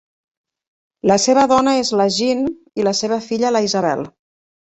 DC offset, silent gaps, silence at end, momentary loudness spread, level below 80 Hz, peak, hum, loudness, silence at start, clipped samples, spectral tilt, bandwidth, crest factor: under 0.1%; none; 0.6 s; 8 LU; -56 dBFS; -2 dBFS; none; -17 LUFS; 1.05 s; under 0.1%; -4 dB/octave; 8.2 kHz; 16 dB